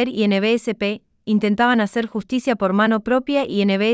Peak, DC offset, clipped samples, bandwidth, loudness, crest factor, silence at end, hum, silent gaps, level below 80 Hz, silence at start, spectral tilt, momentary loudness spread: -4 dBFS; under 0.1%; under 0.1%; 8 kHz; -19 LUFS; 14 dB; 0 s; none; none; -58 dBFS; 0 s; -6.5 dB/octave; 7 LU